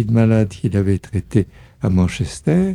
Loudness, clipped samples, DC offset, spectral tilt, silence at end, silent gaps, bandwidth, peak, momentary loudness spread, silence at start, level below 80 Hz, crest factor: -19 LUFS; under 0.1%; under 0.1%; -8 dB/octave; 0 s; none; 11.5 kHz; -2 dBFS; 7 LU; 0 s; -38 dBFS; 14 dB